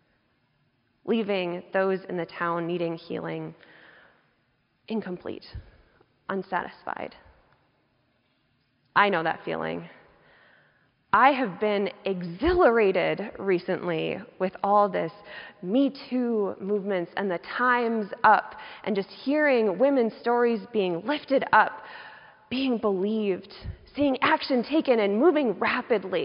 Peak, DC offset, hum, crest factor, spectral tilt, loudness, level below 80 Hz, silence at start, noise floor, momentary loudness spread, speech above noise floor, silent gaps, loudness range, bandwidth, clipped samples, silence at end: -6 dBFS; under 0.1%; none; 20 dB; -3.5 dB/octave; -25 LUFS; -54 dBFS; 1.05 s; -70 dBFS; 16 LU; 45 dB; none; 11 LU; 5.4 kHz; under 0.1%; 0 s